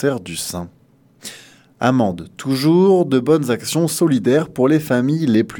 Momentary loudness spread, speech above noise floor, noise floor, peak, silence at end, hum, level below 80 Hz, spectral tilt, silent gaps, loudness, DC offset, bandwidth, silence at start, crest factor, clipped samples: 18 LU; 27 dB; -44 dBFS; 0 dBFS; 0 s; none; -56 dBFS; -6 dB/octave; none; -17 LUFS; under 0.1%; 19 kHz; 0 s; 18 dB; under 0.1%